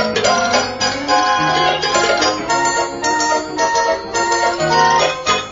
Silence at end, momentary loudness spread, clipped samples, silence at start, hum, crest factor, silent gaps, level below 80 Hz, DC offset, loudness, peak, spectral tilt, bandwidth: 0 s; 4 LU; under 0.1%; 0 s; none; 14 dB; none; -46 dBFS; under 0.1%; -15 LUFS; -2 dBFS; -2 dB/octave; 7.8 kHz